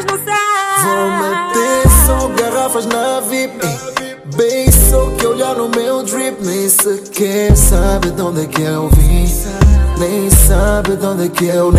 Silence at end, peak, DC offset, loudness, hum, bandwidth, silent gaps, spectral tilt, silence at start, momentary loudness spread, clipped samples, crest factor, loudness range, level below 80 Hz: 0 s; 0 dBFS; under 0.1%; -13 LUFS; none; 16 kHz; none; -4.5 dB/octave; 0 s; 9 LU; under 0.1%; 12 dB; 1 LU; -16 dBFS